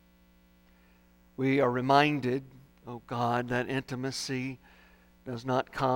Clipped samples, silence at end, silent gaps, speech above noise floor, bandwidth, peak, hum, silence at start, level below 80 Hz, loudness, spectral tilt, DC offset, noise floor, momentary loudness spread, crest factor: under 0.1%; 0 s; none; 32 dB; 16.5 kHz; -8 dBFS; 60 Hz at -50 dBFS; 1.4 s; -62 dBFS; -30 LUFS; -5.5 dB/octave; under 0.1%; -62 dBFS; 21 LU; 24 dB